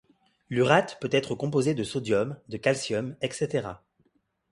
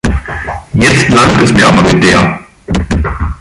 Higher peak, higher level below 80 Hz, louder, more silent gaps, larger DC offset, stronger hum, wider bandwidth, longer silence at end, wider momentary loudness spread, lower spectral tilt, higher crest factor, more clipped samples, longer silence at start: second, -4 dBFS vs 0 dBFS; second, -62 dBFS vs -20 dBFS; second, -27 LUFS vs -9 LUFS; neither; neither; neither; about the same, 11.5 kHz vs 11.5 kHz; first, 0.75 s vs 0.05 s; about the same, 10 LU vs 11 LU; about the same, -5.5 dB/octave vs -5 dB/octave; first, 24 dB vs 10 dB; neither; first, 0.5 s vs 0.05 s